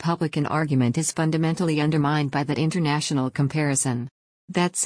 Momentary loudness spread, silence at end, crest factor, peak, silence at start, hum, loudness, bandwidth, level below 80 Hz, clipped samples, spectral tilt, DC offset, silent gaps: 3 LU; 0 s; 14 dB; -10 dBFS; 0 s; none; -23 LUFS; 10.5 kHz; -60 dBFS; under 0.1%; -5 dB/octave; under 0.1%; 4.11-4.48 s